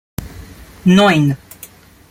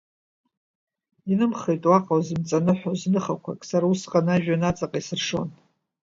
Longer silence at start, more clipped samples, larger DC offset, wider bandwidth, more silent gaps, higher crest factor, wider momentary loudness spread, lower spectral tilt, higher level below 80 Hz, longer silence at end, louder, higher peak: second, 0.2 s vs 1.25 s; neither; neither; first, 16 kHz vs 7.8 kHz; neither; about the same, 16 dB vs 20 dB; first, 25 LU vs 9 LU; about the same, -6 dB/octave vs -6.5 dB/octave; first, -42 dBFS vs -56 dBFS; first, 0.75 s vs 0.5 s; first, -13 LUFS vs -24 LUFS; first, -2 dBFS vs -6 dBFS